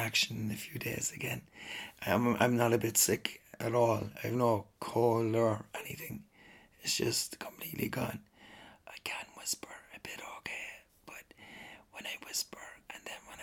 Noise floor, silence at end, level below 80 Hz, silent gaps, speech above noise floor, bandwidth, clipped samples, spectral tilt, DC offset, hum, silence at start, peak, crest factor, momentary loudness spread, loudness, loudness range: -60 dBFS; 0 s; -68 dBFS; none; 26 dB; 19 kHz; under 0.1%; -3.5 dB/octave; under 0.1%; none; 0 s; -14 dBFS; 22 dB; 21 LU; -34 LUFS; 12 LU